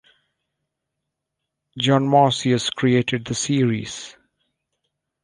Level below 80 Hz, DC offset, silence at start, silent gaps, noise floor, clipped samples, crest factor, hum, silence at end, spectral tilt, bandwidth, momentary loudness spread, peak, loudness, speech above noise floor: -58 dBFS; under 0.1%; 1.75 s; none; -81 dBFS; under 0.1%; 20 dB; none; 1.15 s; -5 dB/octave; 11 kHz; 13 LU; -4 dBFS; -20 LUFS; 62 dB